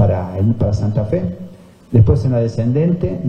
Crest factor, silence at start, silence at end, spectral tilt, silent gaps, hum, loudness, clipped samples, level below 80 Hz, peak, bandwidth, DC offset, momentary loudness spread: 14 dB; 0 s; 0 s; -10 dB/octave; none; none; -16 LUFS; under 0.1%; -34 dBFS; 0 dBFS; 7 kHz; under 0.1%; 9 LU